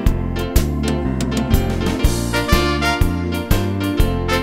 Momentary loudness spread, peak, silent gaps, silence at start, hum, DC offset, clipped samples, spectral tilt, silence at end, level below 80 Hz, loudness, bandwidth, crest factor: 4 LU; 0 dBFS; none; 0 s; none; under 0.1%; under 0.1%; -5.5 dB/octave; 0 s; -22 dBFS; -19 LUFS; 16.5 kHz; 16 dB